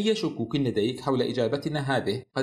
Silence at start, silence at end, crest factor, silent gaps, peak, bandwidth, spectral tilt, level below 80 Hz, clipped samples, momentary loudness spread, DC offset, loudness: 0 s; 0 s; 16 dB; none; -12 dBFS; 13.5 kHz; -6 dB/octave; -60 dBFS; under 0.1%; 3 LU; under 0.1%; -27 LUFS